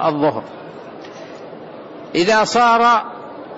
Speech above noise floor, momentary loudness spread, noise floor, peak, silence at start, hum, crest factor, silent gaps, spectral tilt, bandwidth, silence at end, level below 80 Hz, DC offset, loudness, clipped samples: 19 dB; 22 LU; -34 dBFS; -6 dBFS; 0 s; none; 14 dB; none; -4 dB/octave; 8 kHz; 0 s; -58 dBFS; under 0.1%; -15 LUFS; under 0.1%